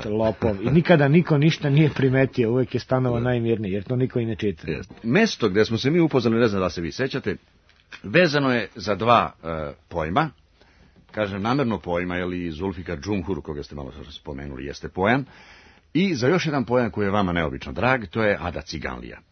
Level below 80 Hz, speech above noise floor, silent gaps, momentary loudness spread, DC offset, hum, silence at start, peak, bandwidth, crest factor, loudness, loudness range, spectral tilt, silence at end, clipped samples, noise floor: -48 dBFS; 33 dB; none; 14 LU; under 0.1%; none; 0 s; -2 dBFS; 6.6 kHz; 20 dB; -22 LUFS; 7 LU; -7 dB/octave; 0.15 s; under 0.1%; -55 dBFS